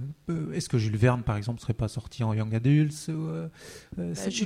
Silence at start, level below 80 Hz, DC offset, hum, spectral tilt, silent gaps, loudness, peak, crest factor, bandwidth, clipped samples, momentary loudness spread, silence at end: 0 s; -50 dBFS; under 0.1%; none; -6.5 dB/octave; none; -28 LUFS; -8 dBFS; 20 dB; 13.5 kHz; under 0.1%; 12 LU; 0 s